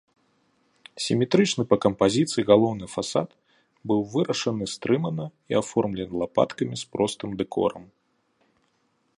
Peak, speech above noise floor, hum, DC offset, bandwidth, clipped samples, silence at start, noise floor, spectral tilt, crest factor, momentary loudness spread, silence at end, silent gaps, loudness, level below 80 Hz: -4 dBFS; 46 dB; none; under 0.1%; 11.5 kHz; under 0.1%; 0.95 s; -70 dBFS; -5.5 dB/octave; 22 dB; 10 LU; 1.35 s; none; -25 LUFS; -58 dBFS